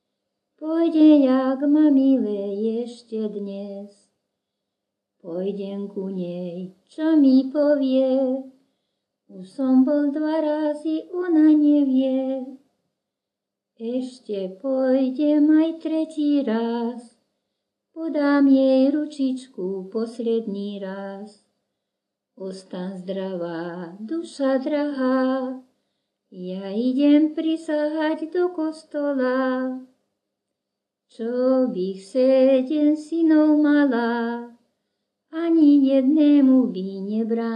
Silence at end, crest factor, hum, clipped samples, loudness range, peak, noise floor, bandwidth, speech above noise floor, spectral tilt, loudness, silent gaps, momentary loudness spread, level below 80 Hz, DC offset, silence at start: 0 s; 16 dB; none; under 0.1%; 11 LU; -6 dBFS; -85 dBFS; 9.2 kHz; 64 dB; -7.5 dB/octave; -21 LUFS; none; 16 LU; -84 dBFS; under 0.1%; 0.6 s